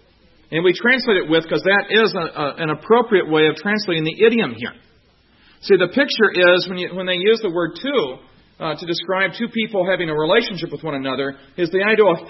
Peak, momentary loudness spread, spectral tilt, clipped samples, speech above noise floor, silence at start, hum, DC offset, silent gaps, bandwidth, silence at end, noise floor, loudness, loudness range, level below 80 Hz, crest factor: -2 dBFS; 11 LU; -6.5 dB/octave; under 0.1%; 37 dB; 0.5 s; none; under 0.1%; none; 6 kHz; 0 s; -55 dBFS; -18 LUFS; 4 LU; -56 dBFS; 16 dB